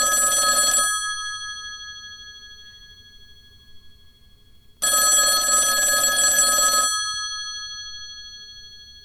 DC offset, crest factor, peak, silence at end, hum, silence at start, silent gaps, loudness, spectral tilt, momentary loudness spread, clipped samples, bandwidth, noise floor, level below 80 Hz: under 0.1%; 16 dB; -6 dBFS; 0.05 s; none; 0 s; none; -17 LUFS; 2 dB/octave; 22 LU; under 0.1%; 17.5 kHz; -51 dBFS; -52 dBFS